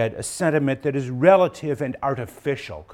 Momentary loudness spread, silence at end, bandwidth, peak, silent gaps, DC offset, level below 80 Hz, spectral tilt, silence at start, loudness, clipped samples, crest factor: 12 LU; 0 s; 14.5 kHz; -2 dBFS; none; under 0.1%; -54 dBFS; -6 dB/octave; 0 s; -22 LUFS; under 0.1%; 20 dB